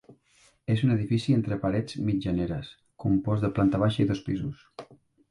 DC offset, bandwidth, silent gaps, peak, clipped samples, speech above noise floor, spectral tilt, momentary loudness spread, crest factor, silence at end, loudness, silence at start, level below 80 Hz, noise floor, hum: under 0.1%; 11 kHz; none; -12 dBFS; under 0.1%; 37 dB; -8 dB/octave; 14 LU; 16 dB; 0.45 s; -27 LUFS; 0.1 s; -50 dBFS; -63 dBFS; none